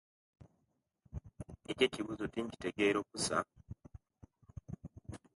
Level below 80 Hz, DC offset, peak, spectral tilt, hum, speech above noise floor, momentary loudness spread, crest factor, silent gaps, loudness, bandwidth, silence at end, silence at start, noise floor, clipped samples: -60 dBFS; under 0.1%; -16 dBFS; -4 dB/octave; none; 45 dB; 21 LU; 24 dB; none; -36 LUFS; 11.5 kHz; 0.2 s; 0.4 s; -81 dBFS; under 0.1%